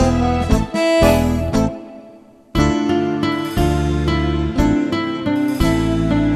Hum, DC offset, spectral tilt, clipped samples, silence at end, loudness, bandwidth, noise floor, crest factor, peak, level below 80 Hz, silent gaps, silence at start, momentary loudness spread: none; under 0.1%; -6.5 dB/octave; under 0.1%; 0 s; -17 LUFS; 14 kHz; -43 dBFS; 16 dB; 0 dBFS; -26 dBFS; none; 0 s; 6 LU